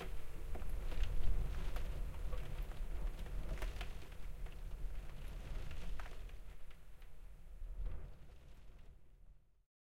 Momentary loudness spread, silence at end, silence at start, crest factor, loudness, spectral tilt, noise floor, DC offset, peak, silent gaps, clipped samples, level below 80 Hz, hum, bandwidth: 18 LU; 0.5 s; 0 s; 18 dB; -49 LUFS; -5.5 dB/octave; -62 dBFS; under 0.1%; -22 dBFS; none; under 0.1%; -44 dBFS; none; 14 kHz